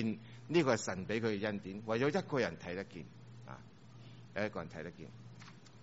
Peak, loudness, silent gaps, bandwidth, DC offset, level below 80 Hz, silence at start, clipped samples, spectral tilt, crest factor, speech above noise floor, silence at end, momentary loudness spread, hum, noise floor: -16 dBFS; -37 LUFS; none; 7.6 kHz; under 0.1%; -70 dBFS; 0 s; under 0.1%; -5 dB/octave; 22 dB; 19 dB; 0 s; 21 LU; none; -56 dBFS